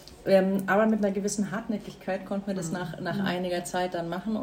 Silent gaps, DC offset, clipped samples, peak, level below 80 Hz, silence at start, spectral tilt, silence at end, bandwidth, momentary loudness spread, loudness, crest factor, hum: none; under 0.1%; under 0.1%; -10 dBFS; -58 dBFS; 0 s; -5.5 dB/octave; 0 s; 16 kHz; 10 LU; -28 LUFS; 18 dB; none